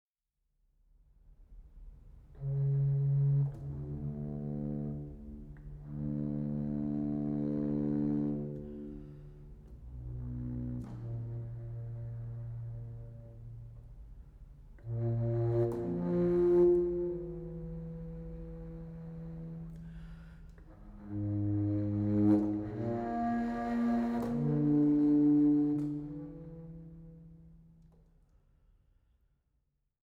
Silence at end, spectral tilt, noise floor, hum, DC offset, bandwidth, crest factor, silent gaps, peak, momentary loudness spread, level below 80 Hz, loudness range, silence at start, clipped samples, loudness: 2.4 s; -11 dB/octave; -83 dBFS; none; under 0.1%; 4.5 kHz; 18 dB; none; -16 dBFS; 22 LU; -52 dBFS; 14 LU; 1.4 s; under 0.1%; -33 LUFS